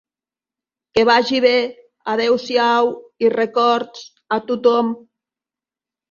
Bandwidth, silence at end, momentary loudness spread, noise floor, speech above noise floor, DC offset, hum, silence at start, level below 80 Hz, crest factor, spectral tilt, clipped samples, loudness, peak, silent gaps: 7.2 kHz; 1.15 s; 12 LU; under -90 dBFS; over 73 dB; under 0.1%; none; 0.95 s; -62 dBFS; 18 dB; -4 dB/octave; under 0.1%; -17 LUFS; -2 dBFS; none